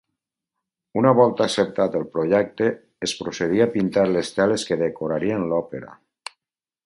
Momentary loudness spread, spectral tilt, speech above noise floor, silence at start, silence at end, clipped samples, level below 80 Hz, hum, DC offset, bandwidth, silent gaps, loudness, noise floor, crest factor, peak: 14 LU; -5.5 dB/octave; 69 dB; 0.95 s; 0.95 s; under 0.1%; -58 dBFS; none; under 0.1%; 11.5 kHz; none; -21 LUFS; -89 dBFS; 20 dB; -2 dBFS